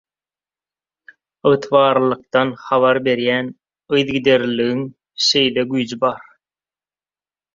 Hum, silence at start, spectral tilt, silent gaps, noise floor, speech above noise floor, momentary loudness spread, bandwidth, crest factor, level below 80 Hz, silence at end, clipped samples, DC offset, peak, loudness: none; 1.45 s; -4.5 dB/octave; none; under -90 dBFS; over 73 dB; 7 LU; 7.6 kHz; 18 dB; -60 dBFS; 1.35 s; under 0.1%; under 0.1%; -2 dBFS; -17 LUFS